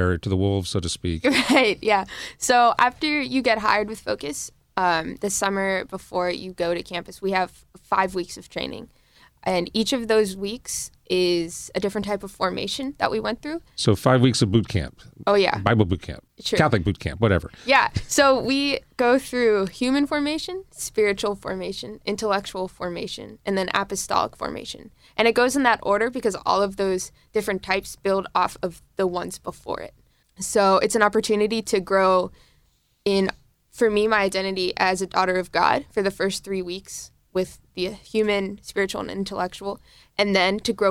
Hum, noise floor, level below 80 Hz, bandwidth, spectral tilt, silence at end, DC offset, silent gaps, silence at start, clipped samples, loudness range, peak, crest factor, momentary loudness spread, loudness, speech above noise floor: none; -63 dBFS; -50 dBFS; 16.5 kHz; -4.5 dB/octave; 0 s; under 0.1%; none; 0 s; under 0.1%; 6 LU; -4 dBFS; 20 dB; 13 LU; -23 LUFS; 40 dB